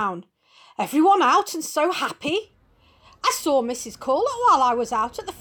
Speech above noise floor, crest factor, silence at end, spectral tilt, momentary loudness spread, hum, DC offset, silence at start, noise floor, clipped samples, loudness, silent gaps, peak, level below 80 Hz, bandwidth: 36 dB; 14 dB; 0 s; -3 dB/octave; 12 LU; none; under 0.1%; 0 s; -58 dBFS; under 0.1%; -21 LUFS; none; -8 dBFS; -60 dBFS; over 20 kHz